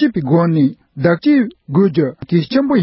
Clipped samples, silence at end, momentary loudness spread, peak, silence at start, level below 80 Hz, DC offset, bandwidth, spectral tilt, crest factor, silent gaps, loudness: under 0.1%; 0 s; 5 LU; -2 dBFS; 0 s; -50 dBFS; under 0.1%; 5.8 kHz; -12.5 dB/octave; 12 dB; none; -15 LUFS